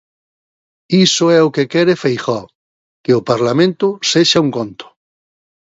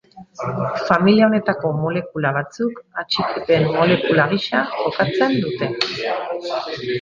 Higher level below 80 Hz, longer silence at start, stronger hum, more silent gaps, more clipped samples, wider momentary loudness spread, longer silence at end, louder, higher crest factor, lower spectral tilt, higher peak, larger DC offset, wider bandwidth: about the same, -58 dBFS vs -54 dBFS; first, 0.9 s vs 0.15 s; neither; first, 2.55-3.04 s vs none; neither; about the same, 11 LU vs 10 LU; first, 0.95 s vs 0 s; first, -14 LUFS vs -19 LUFS; about the same, 16 dB vs 18 dB; second, -4.5 dB/octave vs -6.5 dB/octave; about the same, 0 dBFS vs -2 dBFS; neither; about the same, 8 kHz vs 7.4 kHz